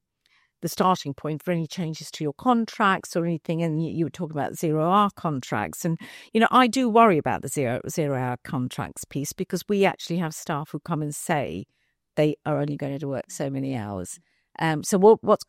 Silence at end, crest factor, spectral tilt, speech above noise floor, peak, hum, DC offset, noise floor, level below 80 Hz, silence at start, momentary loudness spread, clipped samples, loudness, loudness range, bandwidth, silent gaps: 0.05 s; 20 dB; -5.5 dB/octave; 42 dB; -4 dBFS; none; under 0.1%; -66 dBFS; -64 dBFS; 0.6 s; 13 LU; under 0.1%; -25 LUFS; 6 LU; 16 kHz; none